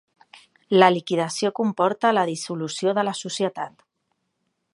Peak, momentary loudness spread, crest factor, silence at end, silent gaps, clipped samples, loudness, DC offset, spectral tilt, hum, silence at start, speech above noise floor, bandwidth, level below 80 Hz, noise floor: 0 dBFS; 11 LU; 22 dB; 1.05 s; none; under 0.1%; -22 LUFS; under 0.1%; -4.5 dB/octave; none; 0.7 s; 53 dB; 11.5 kHz; -76 dBFS; -75 dBFS